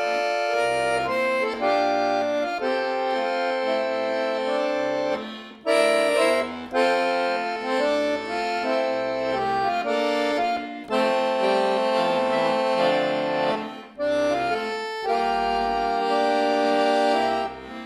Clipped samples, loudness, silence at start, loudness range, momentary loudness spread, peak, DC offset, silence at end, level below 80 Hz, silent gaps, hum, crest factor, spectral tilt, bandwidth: under 0.1%; -23 LUFS; 0 s; 2 LU; 5 LU; -8 dBFS; under 0.1%; 0 s; -58 dBFS; none; none; 14 dB; -4 dB/octave; 13.5 kHz